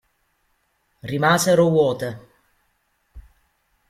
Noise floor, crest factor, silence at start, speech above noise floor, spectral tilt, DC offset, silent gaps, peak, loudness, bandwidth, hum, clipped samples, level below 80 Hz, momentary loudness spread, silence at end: -68 dBFS; 20 dB; 1.05 s; 50 dB; -5 dB/octave; under 0.1%; none; -4 dBFS; -19 LUFS; 16 kHz; none; under 0.1%; -54 dBFS; 19 LU; 0.7 s